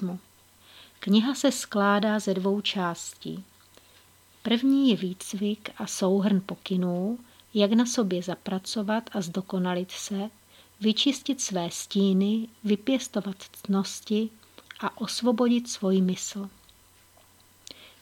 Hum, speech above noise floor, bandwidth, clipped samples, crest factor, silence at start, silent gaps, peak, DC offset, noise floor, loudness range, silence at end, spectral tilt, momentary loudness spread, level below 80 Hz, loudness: none; 31 dB; 17 kHz; under 0.1%; 20 dB; 0 s; none; -8 dBFS; under 0.1%; -58 dBFS; 2 LU; 0.15 s; -5 dB/octave; 14 LU; -72 dBFS; -27 LUFS